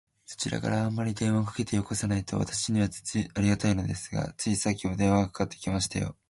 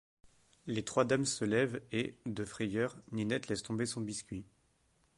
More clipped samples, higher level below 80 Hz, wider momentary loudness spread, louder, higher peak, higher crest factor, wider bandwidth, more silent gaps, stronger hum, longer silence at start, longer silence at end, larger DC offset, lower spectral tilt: neither; first, -48 dBFS vs -66 dBFS; second, 7 LU vs 10 LU; first, -29 LUFS vs -36 LUFS; first, -12 dBFS vs -16 dBFS; second, 16 dB vs 22 dB; about the same, 11.5 kHz vs 11.5 kHz; neither; neither; second, 0.3 s vs 0.65 s; second, 0.2 s vs 0.75 s; neither; about the same, -5 dB/octave vs -4.5 dB/octave